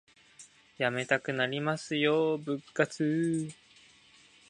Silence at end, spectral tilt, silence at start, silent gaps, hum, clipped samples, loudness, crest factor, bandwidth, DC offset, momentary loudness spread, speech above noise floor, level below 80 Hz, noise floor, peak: 0.95 s; -5.5 dB/octave; 0.4 s; none; none; under 0.1%; -30 LUFS; 22 dB; 11 kHz; under 0.1%; 7 LU; 30 dB; -76 dBFS; -60 dBFS; -10 dBFS